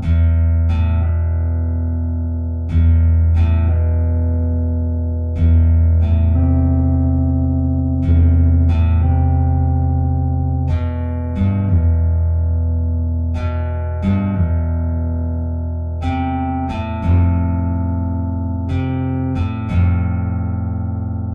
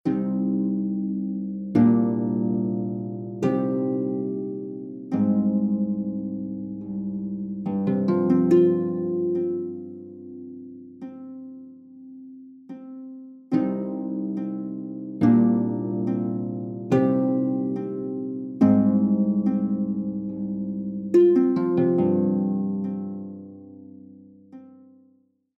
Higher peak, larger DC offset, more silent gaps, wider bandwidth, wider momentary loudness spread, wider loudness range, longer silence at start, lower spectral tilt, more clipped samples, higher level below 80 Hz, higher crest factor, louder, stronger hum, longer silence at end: about the same, -6 dBFS vs -6 dBFS; neither; neither; second, 3.7 kHz vs 6 kHz; second, 7 LU vs 21 LU; second, 4 LU vs 10 LU; about the same, 0 s vs 0.05 s; about the same, -11 dB/octave vs -10.5 dB/octave; neither; first, -20 dBFS vs -64 dBFS; second, 10 dB vs 18 dB; first, -17 LUFS vs -24 LUFS; neither; second, 0 s vs 0.85 s